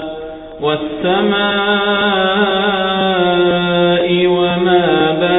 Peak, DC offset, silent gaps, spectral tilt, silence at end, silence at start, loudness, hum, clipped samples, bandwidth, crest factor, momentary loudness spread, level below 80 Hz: -2 dBFS; under 0.1%; none; -8.5 dB/octave; 0 s; 0 s; -13 LUFS; none; under 0.1%; 4 kHz; 12 dB; 6 LU; -44 dBFS